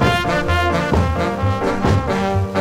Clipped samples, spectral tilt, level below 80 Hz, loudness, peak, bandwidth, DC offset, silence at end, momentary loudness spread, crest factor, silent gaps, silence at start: under 0.1%; -6.5 dB/octave; -28 dBFS; -18 LUFS; -2 dBFS; 15.5 kHz; under 0.1%; 0 s; 2 LU; 14 dB; none; 0 s